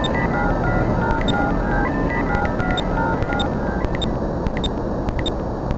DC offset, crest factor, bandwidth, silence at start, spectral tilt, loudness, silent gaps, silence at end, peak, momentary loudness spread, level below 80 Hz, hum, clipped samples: under 0.1%; 16 dB; 8 kHz; 0 s; -7 dB/octave; -21 LUFS; none; 0 s; -4 dBFS; 4 LU; -26 dBFS; none; under 0.1%